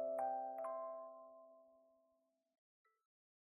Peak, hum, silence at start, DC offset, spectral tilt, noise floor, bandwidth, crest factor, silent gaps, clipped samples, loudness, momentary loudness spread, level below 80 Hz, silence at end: -32 dBFS; none; 0 s; under 0.1%; 1.5 dB/octave; -83 dBFS; 2.5 kHz; 16 dB; none; under 0.1%; -46 LUFS; 20 LU; under -90 dBFS; 1.65 s